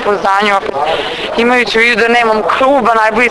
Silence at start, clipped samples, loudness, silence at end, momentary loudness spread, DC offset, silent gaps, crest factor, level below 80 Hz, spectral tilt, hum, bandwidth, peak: 0 s; 0.2%; -10 LUFS; 0 s; 6 LU; under 0.1%; none; 10 dB; -42 dBFS; -3.5 dB/octave; none; 11 kHz; 0 dBFS